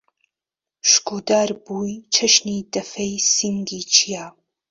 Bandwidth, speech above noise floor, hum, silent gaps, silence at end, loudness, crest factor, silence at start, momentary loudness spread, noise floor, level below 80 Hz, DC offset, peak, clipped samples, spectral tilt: 8 kHz; 68 dB; none; none; 0.4 s; -18 LUFS; 22 dB; 0.85 s; 12 LU; -89 dBFS; -62 dBFS; under 0.1%; 0 dBFS; under 0.1%; -1.5 dB/octave